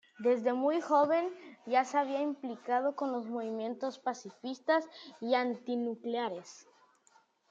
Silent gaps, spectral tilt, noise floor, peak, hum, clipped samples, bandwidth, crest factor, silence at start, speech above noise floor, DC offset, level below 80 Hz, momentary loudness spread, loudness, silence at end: none; -4.5 dB/octave; -68 dBFS; -16 dBFS; none; under 0.1%; 7.8 kHz; 18 dB; 0.2 s; 35 dB; under 0.1%; under -90 dBFS; 13 LU; -33 LUFS; 0.9 s